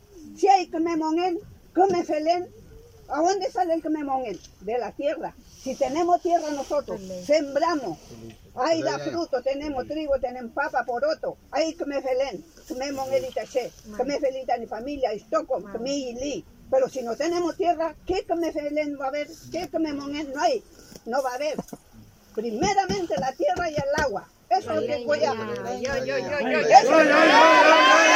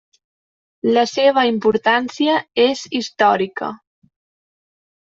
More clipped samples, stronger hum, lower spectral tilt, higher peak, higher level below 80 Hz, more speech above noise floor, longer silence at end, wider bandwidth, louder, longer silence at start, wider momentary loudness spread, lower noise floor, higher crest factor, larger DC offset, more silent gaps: neither; neither; about the same, -3.5 dB/octave vs -4 dB/octave; about the same, 0 dBFS vs -2 dBFS; first, -54 dBFS vs -64 dBFS; second, 27 dB vs over 73 dB; second, 0 s vs 1.35 s; first, 16 kHz vs 7.8 kHz; second, -24 LUFS vs -17 LUFS; second, 0.15 s vs 0.85 s; first, 14 LU vs 9 LU; second, -51 dBFS vs under -90 dBFS; first, 22 dB vs 16 dB; neither; neither